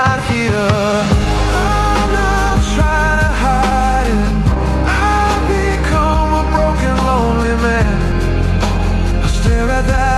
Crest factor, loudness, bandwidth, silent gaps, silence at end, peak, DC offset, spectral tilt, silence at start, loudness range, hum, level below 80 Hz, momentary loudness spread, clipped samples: 12 dB; -14 LUFS; 12.5 kHz; none; 0 s; -2 dBFS; under 0.1%; -6 dB/octave; 0 s; 1 LU; none; -16 dBFS; 2 LU; under 0.1%